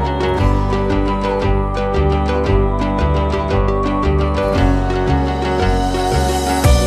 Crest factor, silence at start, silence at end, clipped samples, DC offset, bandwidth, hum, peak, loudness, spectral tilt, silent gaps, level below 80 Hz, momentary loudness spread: 14 dB; 0 s; 0 s; under 0.1%; under 0.1%; 13.5 kHz; none; 0 dBFS; -17 LUFS; -6.5 dB/octave; none; -20 dBFS; 2 LU